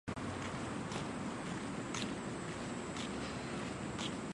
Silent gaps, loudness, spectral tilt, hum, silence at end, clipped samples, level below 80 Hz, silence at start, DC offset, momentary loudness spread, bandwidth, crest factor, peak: none; -42 LUFS; -4.5 dB/octave; none; 0 s; under 0.1%; -60 dBFS; 0.05 s; under 0.1%; 2 LU; 11.5 kHz; 18 dB; -24 dBFS